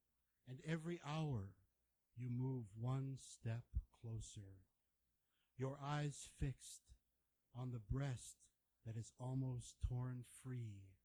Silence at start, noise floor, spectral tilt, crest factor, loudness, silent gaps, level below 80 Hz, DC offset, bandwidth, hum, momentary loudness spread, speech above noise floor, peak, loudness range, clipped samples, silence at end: 0.45 s; -87 dBFS; -6.5 dB/octave; 18 dB; -49 LUFS; none; -60 dBFS; under 0.1%; 20 kHz; none; 14 LU; 40 dB; -30 dBFS; 3 LU; under 0.1%; 0.1 s